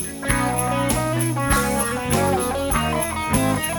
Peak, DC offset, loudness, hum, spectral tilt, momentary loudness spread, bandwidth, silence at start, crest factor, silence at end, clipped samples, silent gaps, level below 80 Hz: -4 dBFS; under 0.1%; -21 LUFS; none; -4.5 dB/octave; 3 LU; over 20 kHz; 0 s; 18 dB; 0 s; under 0.1%; none; -34 dBFS